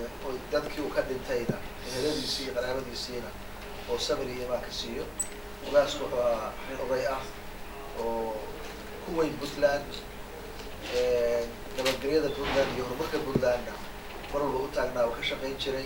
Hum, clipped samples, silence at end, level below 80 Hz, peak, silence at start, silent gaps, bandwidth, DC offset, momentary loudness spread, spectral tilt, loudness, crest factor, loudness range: none; under 0.1%; 0 s; -46 dBFS; -10 dBFS; 0 s; none; 19 kHz; under 0.1%; 13 LU; -4 dB/octave; -31 LUFS; 20 dB; 4 LU